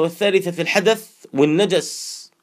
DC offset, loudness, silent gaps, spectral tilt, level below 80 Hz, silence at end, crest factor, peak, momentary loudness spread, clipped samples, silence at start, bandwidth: under 0.1%; -19 LUFS; none; -4 dB/octave; -76 dBFS; 0.15 s; 18 dB; 0 dBFS; 12 LU; under 0.1%; 0 s; 15.5 kHz